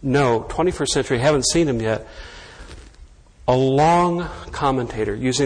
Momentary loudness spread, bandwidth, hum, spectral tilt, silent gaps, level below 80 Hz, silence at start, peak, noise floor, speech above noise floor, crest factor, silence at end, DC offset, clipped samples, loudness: 19 LU; 10.5 kHz; none; -5 dB/octave; none; -40 dBFS; 0 s; -4 dBFS; -46 dBFS; 27 dB; 16 dB; 0 s; under 0.1%; under 0.1%; -20 LUFS